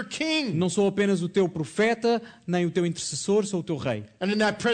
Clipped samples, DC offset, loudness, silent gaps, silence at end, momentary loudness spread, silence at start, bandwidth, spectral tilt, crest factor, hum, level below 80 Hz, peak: under 0.1%; under 0.1%; -26 LUFS; none; 0 s; 6 LU; 0 s; 9.4 kHz; -5 dB/octave; 12 dB; none; -64 dBFS; -12 dBFS